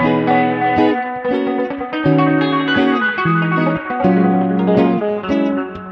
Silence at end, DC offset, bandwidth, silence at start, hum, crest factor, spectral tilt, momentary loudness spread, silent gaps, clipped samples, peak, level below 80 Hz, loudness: 0 s; under 0.1%; 6.2 kHz; 0 s; none; 14 dB; -8.5 dB/octave; 6 LU; none; under 0.1%; 0 dBFS; -48 dBFS; -16 LUFS